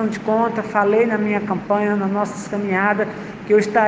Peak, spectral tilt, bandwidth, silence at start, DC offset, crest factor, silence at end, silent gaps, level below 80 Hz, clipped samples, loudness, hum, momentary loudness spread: -2 dBFS; -6.5 dB/octave; 9.4 kHz; 0 s; under 0.1%; 16 dB; 0 s; none; -60 dBFS; under 0.1%; -19 LUFS; none; 7 LU